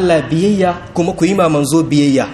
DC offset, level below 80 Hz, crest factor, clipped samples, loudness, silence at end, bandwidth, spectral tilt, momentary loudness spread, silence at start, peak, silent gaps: under 0.1%; -42 dBFS; 12 dB; under 0.1%; -13 LUFS; 0 s; 13.5 kHz; -6 dB/octave; 4 LU; 0 s; 0 dBFS; none